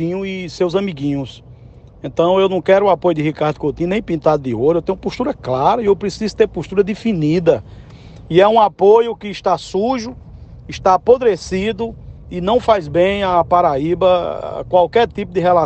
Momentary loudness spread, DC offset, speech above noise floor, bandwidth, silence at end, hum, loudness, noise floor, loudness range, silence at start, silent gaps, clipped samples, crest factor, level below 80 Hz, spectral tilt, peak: 11 LU; under 0.1%; 25 dB; 8.6 kHz; 0 s; none; -16 LUFS; -40 dBFS; 2 LU; 0 s; none; under 0.1%; 16 dB; -42 dBFS; -6.5 dB/octave; 0 dBFS